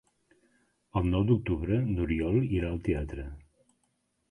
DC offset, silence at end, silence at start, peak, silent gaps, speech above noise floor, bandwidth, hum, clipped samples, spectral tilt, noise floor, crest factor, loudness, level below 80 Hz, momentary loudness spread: under 0.1%; 0.9 s; 0.95 s; -12 dBFS; none; 47 dB; 10.5 kHz; none; under 0.1%; -9.5 dB/octave; -76 dBFS; 18 dB; -29 LUFS; -42 dBFS; 10 LU